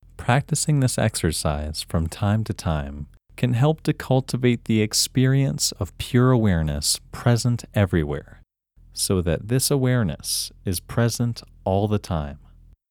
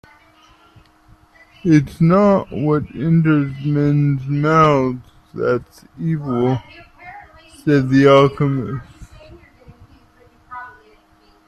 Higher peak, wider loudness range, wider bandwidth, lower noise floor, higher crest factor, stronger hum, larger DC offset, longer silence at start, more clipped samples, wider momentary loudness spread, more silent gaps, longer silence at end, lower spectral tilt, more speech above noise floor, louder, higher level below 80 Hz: second, -4 dBFS vs 0 dBFS; about the same, 3 LU vs 4 LU; first, 19 kHz vs 9.6 kHz; about the same, -54 dBFS vs -53 dBFS; about the same, 18 dB vs 18 dB; neither; neither; second, 0.2 s vs 1.65 s; neither; second, 9 LU vs 21 LU; neither; second, 0.55 s vs 0.75 s; second, -5 dB/octave vs -8.5 dB/octave; second, 32 dB vs 37 dB; second, -22 LUFS vs -16 LUFS; first, -40 dBFS vs -48 dBFS